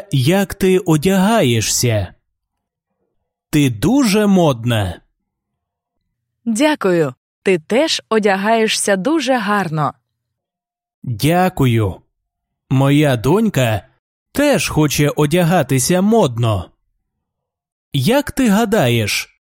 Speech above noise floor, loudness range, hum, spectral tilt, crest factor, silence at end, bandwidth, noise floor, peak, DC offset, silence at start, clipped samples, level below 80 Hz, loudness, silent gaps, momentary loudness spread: 71 dB; 3 LU; none; -5 dB/octave; 16 dB; 0.35 s; 16.5 kHz; -85 dBFS; -2 dBFS; under 0.1%; 0 s; under 0.1%; -44 dBFS; -15 LUFS; 7.17-7.42 s, 10.94-11.02 s, 13.99-14.26 s, 17.72-17.91 s; 8 LU